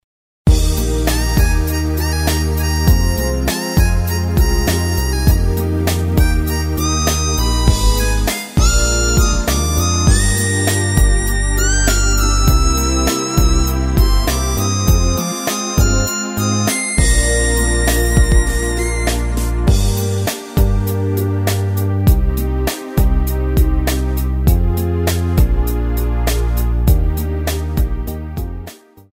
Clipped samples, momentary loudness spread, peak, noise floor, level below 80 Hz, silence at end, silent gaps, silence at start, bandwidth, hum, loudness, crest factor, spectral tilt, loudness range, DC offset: under 0.1%; 5 LU; 0 dBFS; -36 dBFS; -16 dBFS; 0.4 s; none; 0.45 s; 16.5 kHz; none; -16 LUFS; 14 dB; -4.5 dB/octave; 3 LU; under 0.1%